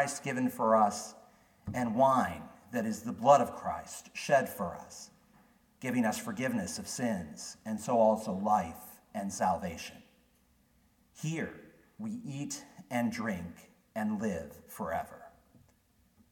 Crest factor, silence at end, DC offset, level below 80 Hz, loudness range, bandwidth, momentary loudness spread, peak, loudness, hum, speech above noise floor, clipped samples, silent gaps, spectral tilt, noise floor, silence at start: 22 dB; 1.05 s; under 0.1%; -66 dBFS; 9 LU; 18 kHz; 19 LU; -10 dBFS; -33 LUFS; none; 37 dB; under 0.1%; none; -5 dB/octave; -68 dBFS; 0 s